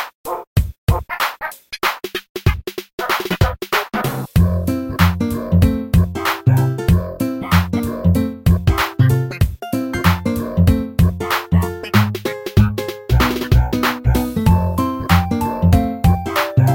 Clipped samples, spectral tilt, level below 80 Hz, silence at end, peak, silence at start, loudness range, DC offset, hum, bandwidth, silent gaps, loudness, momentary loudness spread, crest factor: under 0.1%; -6.5 dB/octave; -26 dBFS; 0 s; 0 dBFS; 0 s; 4 LU; under 0.1%; none; 17 kHz; 0.14-0.24 s, 0.47-0.56 s, 0.78-0.87 s, 2.29-2.35 s, 2.93-2.98 s; -18 LUFS; 6 LU; 16 dB